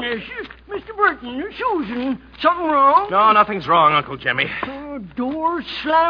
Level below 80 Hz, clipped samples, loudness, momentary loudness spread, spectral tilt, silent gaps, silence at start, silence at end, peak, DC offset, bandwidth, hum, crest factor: -50 dBFS; under 0.1%; -18 LUFS; 17 LU; -7 dB/octave; none; 0 s; 0 s; -2 dBFS; under 0.1%; 5.4 kHz; none; 16 dB